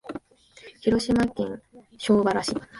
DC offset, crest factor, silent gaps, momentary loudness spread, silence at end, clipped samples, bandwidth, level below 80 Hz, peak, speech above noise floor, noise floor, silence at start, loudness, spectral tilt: under 0.1%; 18 dB; none; 18 LU; 0 s; under 0.1%; 11.5 kHz; -50 dBFS; -8 dBFS; 28 dB; -51 dBFS; 0.05 s; -24 LUFS; -5.5 dB/octave